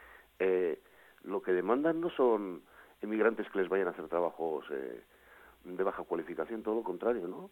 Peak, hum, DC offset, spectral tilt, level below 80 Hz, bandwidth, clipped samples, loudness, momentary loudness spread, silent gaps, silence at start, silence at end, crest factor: -16 dBFS; none; under 0.1%; -7.5 dB/octave; -72 dBFS; 17 kHz; under 0.1%; -34 LUFS; 15 LU; none; 0 s; 0.05 s; 18 dB